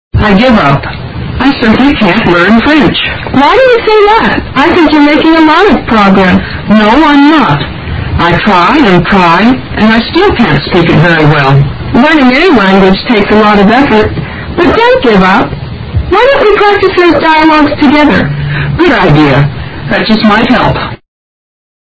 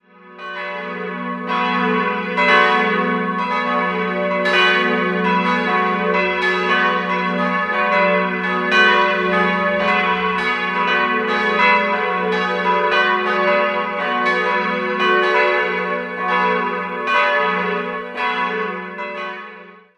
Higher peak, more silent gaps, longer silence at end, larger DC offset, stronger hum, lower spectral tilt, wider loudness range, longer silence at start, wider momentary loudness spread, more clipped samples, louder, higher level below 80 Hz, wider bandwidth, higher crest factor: about the same, 0 dBFS vs -2 dBFS; neither; first, 0.9 s vs 0.25 s; neither; neither; first, -7 dB/octave vs -5.5 dB/octave; about the same, 2 LU vs 2 LU; about the same, 0.15 s vs 0.25 s; second, 8 LU vs 11 LU; first, 4% vs under 0.1%; first, -5 LUFS vs -17 LUFS; first, -24 dBFS vs -58 dBFS; second, 8 kHz vs 11 kHz; second, 6 dB vs 16 dB